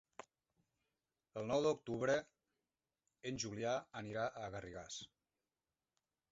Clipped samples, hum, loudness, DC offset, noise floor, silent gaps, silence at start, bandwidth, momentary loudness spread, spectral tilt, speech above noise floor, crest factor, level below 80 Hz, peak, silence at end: under 0.1%; none; -42 LUFS; under 0.1%; under -90 dBFS; none; 0.2 s; 7.6 kHz; 15 LU; -4 dB/octave; over 49 dB; 20 dB; -74 dBFS; -24 dBFS; 1.25 s